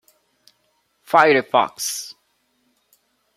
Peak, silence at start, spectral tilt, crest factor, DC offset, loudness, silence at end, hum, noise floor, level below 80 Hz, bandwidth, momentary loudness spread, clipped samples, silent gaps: -2 dBFS; 1.1 s; -2.5 dB/octave; 22 dB; under 0.1%; -18 LUFS; 1.25 s; none; -67 dBFS; -74 dBFS; 16 kHz; 15 LU; under 0.1%; none